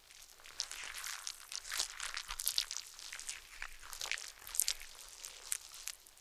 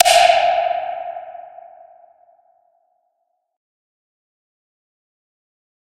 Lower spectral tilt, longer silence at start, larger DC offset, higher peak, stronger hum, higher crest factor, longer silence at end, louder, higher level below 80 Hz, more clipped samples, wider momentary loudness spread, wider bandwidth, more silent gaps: second, 3 dB/octave vs 1 dB/octave; about the same, 0 s vs 0 s; neither; second, -6 dBFS vs 0 dBFS; neither; first, 38 dB vs 22 dB; second, 0 s vs 4.5 s; second, -41 LUFS vs -16 LUFS; about the same, -62 dBFS vs -60 dBFS; neither; second, 13 LU vs 26 LU; first, over 20 kHz vs 15 kHz; neither